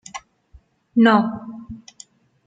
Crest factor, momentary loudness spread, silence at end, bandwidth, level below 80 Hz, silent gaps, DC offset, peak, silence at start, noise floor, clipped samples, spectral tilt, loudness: 20 dB; 24 LU; 0.7 s; 7.8 kHz; -54 dBFS; none; under 0.1%; -2 dBFS; 0.15 s; -53 dBFS; under 0.1%; -5.5 dB/octave; -17 LUFS